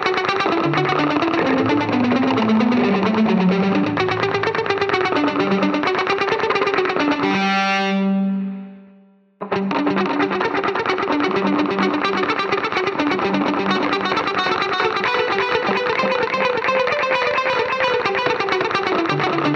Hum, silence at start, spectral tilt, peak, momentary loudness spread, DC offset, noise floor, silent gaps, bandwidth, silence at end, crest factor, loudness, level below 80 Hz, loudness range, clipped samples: none; 0 s; -6 dB/octave; -4 dBFS; 3 LU; under 0.1%; -50 dBFS; none; 8 kHz; 0 s; 14 dB; -19 LUFS; -56 dBFS; 3 LU; under 0.1%